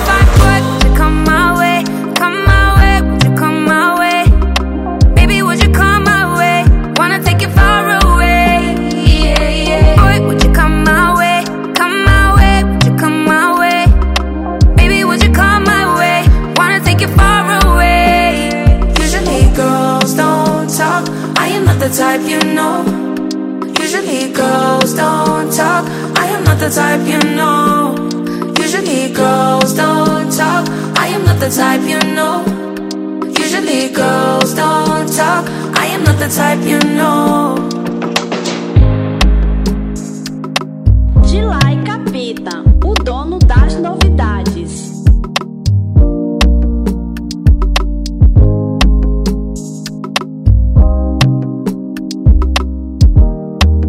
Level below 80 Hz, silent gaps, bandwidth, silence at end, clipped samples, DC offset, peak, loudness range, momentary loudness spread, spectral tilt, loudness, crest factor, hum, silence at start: -14 dBFS; none; 16.5 kHz; 0 s; 0.4%; under 0.1%; 0 dBFS; 4 LU; 9 LU; -5.5 dB/octave; -11 LUFS; 10 dB; none; 0 s